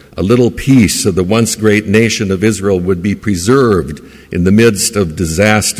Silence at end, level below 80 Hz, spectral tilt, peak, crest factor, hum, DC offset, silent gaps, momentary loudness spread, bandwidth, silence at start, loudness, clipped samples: 0 s; -30 dBFS; -5 dB/octave; 0 dBFS; 10 dB; none; under 0.1%; none; 7 LU; 16 kHz; 0.15 s; -11 LUFS; under 0.1%